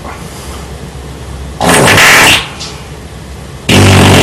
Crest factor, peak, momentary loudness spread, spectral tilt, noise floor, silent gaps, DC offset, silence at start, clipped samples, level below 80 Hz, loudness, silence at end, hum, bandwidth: 8 dB; 0 dBFS; 24 LU; -3.5 dB/octave; -25 dBFS; none; under 0.1%; 0 s; 0.7%; -28 dBFS; -5 LUFS; 0 s; none; 19.5 kHz